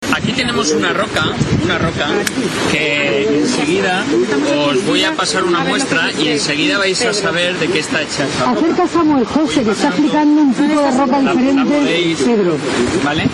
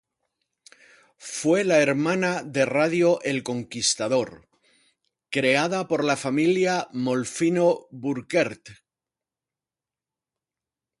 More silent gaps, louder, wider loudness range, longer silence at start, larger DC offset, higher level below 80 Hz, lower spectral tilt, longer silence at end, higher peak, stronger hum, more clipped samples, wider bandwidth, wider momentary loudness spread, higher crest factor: neither; first, -14 LUFS vs -23 LUFS; second, 2 LU vs 5 LU; second, 0 s vs 1.2 s; neither; first, -42 dBFS vs -68 dBFS; about the same, -4 dB/octave vs -4.5 dB/octave; second, 0 s vs 2.25 s; first, 0 dBFS vs -6 dBFS; neither; neither; about the same, 12 kHz vs 11.5 kHz; second, 3 LU vs 9 LU; about the same, 14 dB vs 18 dB